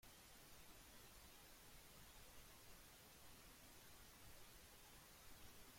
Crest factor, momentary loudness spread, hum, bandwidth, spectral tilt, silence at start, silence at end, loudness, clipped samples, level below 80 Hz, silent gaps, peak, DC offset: 14 dB; 0 LU; none; 16.5 kHz; -2.5 dB/octave; 0 s; 0 s; -63 LUFS; under 0.1%; -72 dBFS; none; -50 dBFS; under 0.1%